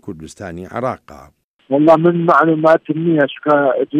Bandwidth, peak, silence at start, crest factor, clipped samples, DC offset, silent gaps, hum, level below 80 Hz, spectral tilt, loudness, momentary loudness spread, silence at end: 10.5 kHz; 0 dBFS; 0.05 s; 14 dB; under 0.1%; under 0.1%; 1.44-1.59 s; none; -54 dBFS; -8 dB/octave; -14 LUFS; 19 LU; 0 s